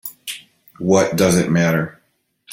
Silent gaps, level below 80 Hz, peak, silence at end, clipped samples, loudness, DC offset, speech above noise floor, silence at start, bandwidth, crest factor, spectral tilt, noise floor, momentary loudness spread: none; -52 dBFS; -2 dBFS; 0 s; under 0.1%; -17 LUFS; under 0.1%; 48 dB; 0.05 s; 17 kHz; 18 dB; -5.5 dB/octave; -64 dBFS; 16 LU